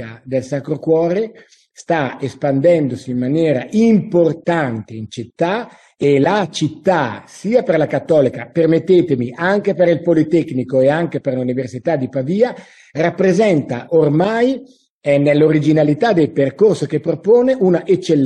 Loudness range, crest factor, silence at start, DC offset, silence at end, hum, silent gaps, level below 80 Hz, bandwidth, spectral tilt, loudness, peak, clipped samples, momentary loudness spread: 3 LU; 14 dB; 0 s; under 0.1%; 0 s; none; 14.90-15.01 s; -58 dBFS; 10.5 kHz; -7.5 dB/octave; -16 LUFS; -2 dBFS; under 0.1%; 9 LU